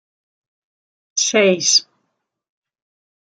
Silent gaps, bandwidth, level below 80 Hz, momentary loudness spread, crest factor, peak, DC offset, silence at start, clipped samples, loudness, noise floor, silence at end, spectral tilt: none; 11 kHz; -74 dBFS; 7 LU; 20 dB; -2 dBFS; under 0.1%; 1.15 s; under 0.1%; -15 LUFS; -73 dBFS; 1.55 s; -1.5 dB/octave